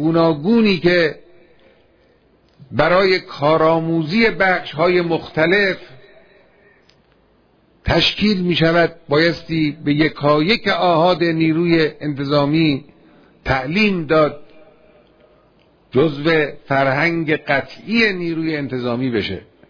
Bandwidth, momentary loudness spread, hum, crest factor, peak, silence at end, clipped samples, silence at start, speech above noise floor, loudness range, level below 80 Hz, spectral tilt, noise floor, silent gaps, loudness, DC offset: 5.4 kHz; 7 LU; none; 18 dB; 0 dBFS; 0.3 s; under 0.1%; 0 s; 39 dB; 4 LU; -42 dBFS; -7 dB/octave; -56 dBFS; none; -17 LUFS; under 0.1%